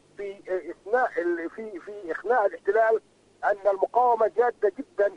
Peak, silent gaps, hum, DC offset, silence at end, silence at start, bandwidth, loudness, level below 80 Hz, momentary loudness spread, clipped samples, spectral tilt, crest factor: -10 dBFS; none; none; under 0.1%; 0 s; 0.2 s; 10 kHz; -25 LUFS; -70 dBFS; 14 LU; under 0.1%; -5.5 dB/octave; 16 dB